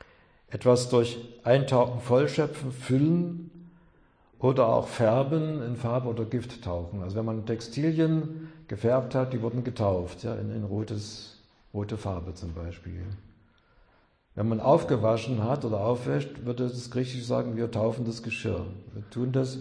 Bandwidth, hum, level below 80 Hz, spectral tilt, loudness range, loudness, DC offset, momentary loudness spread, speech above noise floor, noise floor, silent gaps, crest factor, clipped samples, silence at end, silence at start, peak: 10.5 kHz; none; -54 dBFS; -7 dB/octave; 9 LU; -28 LUFS; under 0.1%; 15 LU; 36 dB; -64 dBFS; none; 20 dB; under 0.1%; 0 s; 0.5 s; -8 dBFS